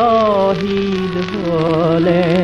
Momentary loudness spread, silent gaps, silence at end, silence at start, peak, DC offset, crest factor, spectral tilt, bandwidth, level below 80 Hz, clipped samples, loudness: 6 LU; none; 0 s; 0 s; -2 dBFS; under 0.1%; 12 dB; -7.5 dB/octave; 9.2 kHz; -42 dBFS; under 0.1%; -15 LUFS